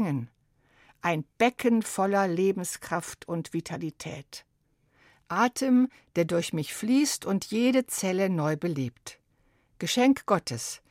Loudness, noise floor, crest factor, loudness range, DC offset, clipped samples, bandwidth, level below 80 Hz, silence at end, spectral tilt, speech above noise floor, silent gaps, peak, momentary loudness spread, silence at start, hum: -27 LUFS; -69 dBFS; 18 dB; 4 LU; under 0.1%; under 0.1%; 16 kHz; -66 dBFS; 0.15 s; -5 dB/octave; 42 dB; none; -10 dBFS; 12 LU; 0 s; none